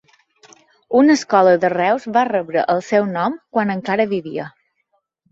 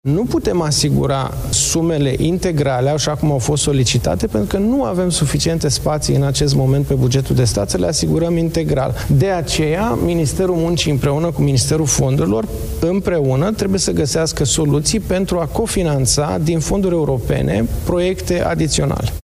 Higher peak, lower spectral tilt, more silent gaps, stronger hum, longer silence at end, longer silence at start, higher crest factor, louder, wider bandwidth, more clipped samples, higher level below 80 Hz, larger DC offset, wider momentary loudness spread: about the same, -2 dBFS vs -2 dBFS; about the same, -5.5 dB/octave vs -5 dB/octave; neither; neither; first, 0.8 s vs 0.05 s; first, 0.9 s vs 0.05 s; about the same, 16 dB vs 14 dB; about the same, -17 LUFS vs -16 LUFS; second, 8 kHz vs 16 kHz; neither; second, -64 dBFS vs -30 dBFS; neither; first, 9 LU vs 3 LU